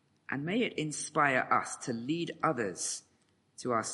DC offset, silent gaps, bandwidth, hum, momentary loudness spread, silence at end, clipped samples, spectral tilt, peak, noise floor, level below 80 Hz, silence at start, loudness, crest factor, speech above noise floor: under 0.1%; none; 11.5 kHz; none; 10 LU; 0 s; under 0.1%; -3.5 dB/octave; -12 dBFS; -71 dBFS; -76 dBFS; 0.3 s; -32 LUFS; 22 dB; 38 dB